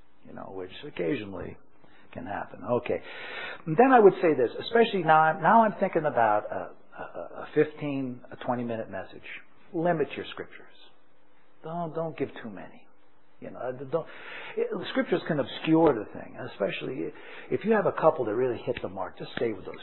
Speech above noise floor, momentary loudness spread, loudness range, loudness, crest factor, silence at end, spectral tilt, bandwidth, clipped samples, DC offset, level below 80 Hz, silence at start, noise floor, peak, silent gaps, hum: 37 dB; 20 LU; 13 LU; -27 LUFS; 22 dB; 0 s; -10 dB/octave; 4.2 kHz; under 0.1%; 0.5%; -66 dBFS; 0.25 s; -65 dBFS; -6 dBFS; none; none